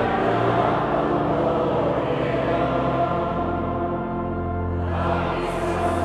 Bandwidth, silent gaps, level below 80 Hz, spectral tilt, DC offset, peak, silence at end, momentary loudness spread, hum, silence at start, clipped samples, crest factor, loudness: 12.5 kHz; none; -40 dBFS; -7.5 dB/octave; under 0.1%; -6 dBFS; 0 s; 5 LU; none; 0 s; under 0.1%; 16 dB; -23 LUFS